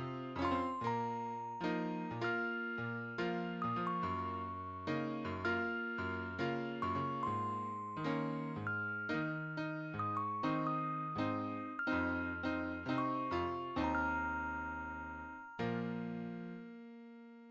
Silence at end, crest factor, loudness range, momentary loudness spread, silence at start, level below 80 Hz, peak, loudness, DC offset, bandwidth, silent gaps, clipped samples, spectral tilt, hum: 0 s; 16 dB; 2 LU; 7 LU; 0 s; -60 dBFS; -24 dBFS; -39 LUFS; under 0.1%; 8 kHz; none; under 0.1%; -7.5 dB/octave; none